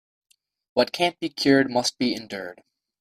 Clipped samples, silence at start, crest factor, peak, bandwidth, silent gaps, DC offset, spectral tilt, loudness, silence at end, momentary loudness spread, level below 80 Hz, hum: under 0.1%; 0.75 s; 20 dB; -6 dBFS; 15 kHz; none; under 0.1%; -4 dB/octave; -23 LUFS; 0.5 s; 15 LU; -64 dBFS; none